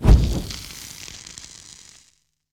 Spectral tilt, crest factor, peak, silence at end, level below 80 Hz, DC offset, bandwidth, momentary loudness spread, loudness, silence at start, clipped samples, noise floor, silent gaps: -6 dB/octave; 20 dB; -2 dBFS; 1.35 s; -24 dBFS; under 0.1%; 16 kHz; 24 LU; -25 LUFS; 0 s; under 0.1%; -62 dBFS; none